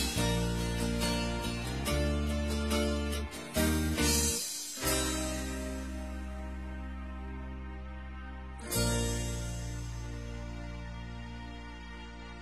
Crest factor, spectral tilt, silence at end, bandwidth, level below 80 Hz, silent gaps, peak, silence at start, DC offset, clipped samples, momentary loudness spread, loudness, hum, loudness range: 18 dB; -4 dB/octave; 0 s; 14.5 kHz; -40 dBFS; none; -16 dBFS; 0 s; 0.1%; under 0.1%; 14 LU; -34 LUFS; none; 9 LU